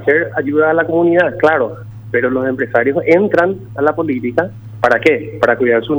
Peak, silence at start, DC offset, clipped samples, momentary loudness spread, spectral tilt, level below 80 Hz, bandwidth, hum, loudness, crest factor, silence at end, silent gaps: 0 dBFS; 0 s; under 0.1%; under 0.1%; 6 LU; -7.5 dB/octave; -50 dBFS; over 20 kHz; none; -14 LUFS; 14 dB; 0 s; none